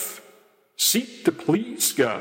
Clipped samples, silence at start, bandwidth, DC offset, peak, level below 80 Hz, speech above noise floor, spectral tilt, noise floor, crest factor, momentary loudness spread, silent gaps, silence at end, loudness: under 0.1%; 0 s; 16.5 kHz; under 0.1%; -6 dBFS; -72 dBFS; 33 dB; -2.5 dB/octave; -56 dBFS; 18 dB; 9 LU; none; 0 s; -22 LUFS